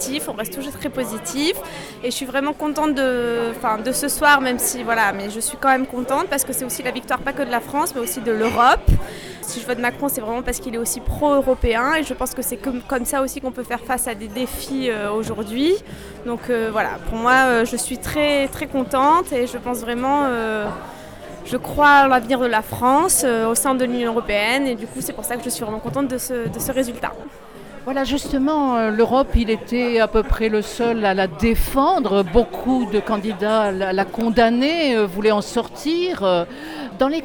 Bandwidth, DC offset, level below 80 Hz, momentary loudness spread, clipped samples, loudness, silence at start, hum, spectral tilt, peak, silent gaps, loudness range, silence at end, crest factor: over 20 kHz; under 0.1%; -34 dBFS; 11 LU; under 0.1%; -20 LUFS; 0 s; none; -4 dB/octave; -4 dBFS; none; 5 LU; 0 s; 16 dB